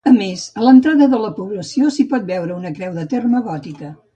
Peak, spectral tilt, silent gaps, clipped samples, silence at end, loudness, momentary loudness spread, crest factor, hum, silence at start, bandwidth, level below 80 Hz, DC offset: 0 dBFS; -6 dB/octave; none; under 0.1%; 0.2 s; -16 LUFS; 15 LU; 14 dB; none; 0.05 s; 8.8 kHz; -60 dBFS; under 0.1%